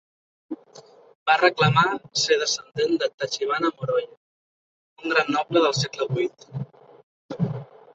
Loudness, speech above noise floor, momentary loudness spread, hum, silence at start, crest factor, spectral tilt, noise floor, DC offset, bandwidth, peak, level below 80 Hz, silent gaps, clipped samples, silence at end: -23 LUFS; 27 dB; 20 LU; none; 0.5 s; 22 dB; -4 dB/octave; -49 dBFS; under 0.1%; 8.2 kHz; -2 dBFS; -64 dBFS; 1.15-1.26 s, 3.14-3.18 s, 4.17-4.96 s, 7.03-7.29 s; under 0.1%; 0.3 s